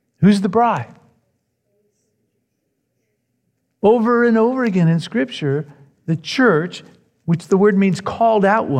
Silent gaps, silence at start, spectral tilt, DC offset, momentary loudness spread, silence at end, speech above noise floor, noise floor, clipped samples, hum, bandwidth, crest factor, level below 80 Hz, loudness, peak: none; 0.2 s; -7 dB/octave; under 0.1%; 12 LU; 0 s; 56 dB; -71 dBFS; under 0.1%; none; 10 kHz; 16 dB; -62 dBFS; -17 LUFS; -2 dBFS